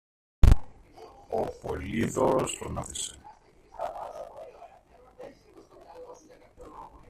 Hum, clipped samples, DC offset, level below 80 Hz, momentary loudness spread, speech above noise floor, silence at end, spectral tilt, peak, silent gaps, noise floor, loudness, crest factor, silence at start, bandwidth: none; under 0.1%; under 0.1%; -32 dBFS; 26 LU; 26 dB; 0.25 s; -5.5 dB/octave; -4 dBFS; none; -56 dBFS; -30 LUFS; 26 dB; 0.45 s; 13.5 kHz